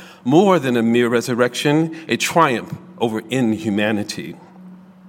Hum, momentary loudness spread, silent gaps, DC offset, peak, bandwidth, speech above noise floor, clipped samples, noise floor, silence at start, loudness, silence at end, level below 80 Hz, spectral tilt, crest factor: none; 10 LU; none; under 0.1%; 0 dBFS; 17 kHz; 24 dB; under 0.1%; -41 dBFS; 0 s; -18 LUFS; 0 s; -64 dBFS; -5 dB/octave; 18 dB